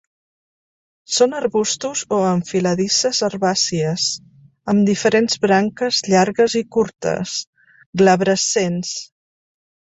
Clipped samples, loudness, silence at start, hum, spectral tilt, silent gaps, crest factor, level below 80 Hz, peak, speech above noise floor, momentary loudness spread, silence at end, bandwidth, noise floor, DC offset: under 0.1%; -18 LUFS; 1.1 s; none; -4 dB/octave; 7.47-7.53 s, 7.86-7.93 s; 18 dB; -58 dBFS; 0 dBFS; over 72 dB; 8 LU; 0.95 s; 8.4 kHz; under -90 dBFS; under 0.1%